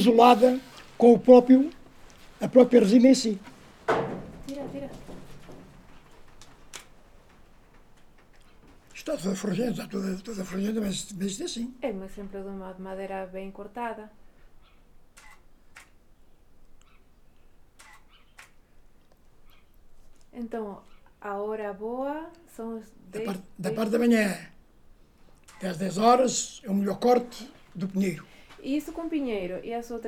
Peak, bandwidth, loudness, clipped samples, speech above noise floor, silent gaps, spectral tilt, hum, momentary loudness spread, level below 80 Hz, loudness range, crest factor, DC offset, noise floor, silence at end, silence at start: -2 dBFS; 15.5 kHz; -25 LUFS; under 0.1%; 30 dB; none; -5.5 dB/octave; none; 23 LU; -54 dBFS; 22 LU; 24 dB; under 0.1%; -55 dBFS; 0 s; 0 s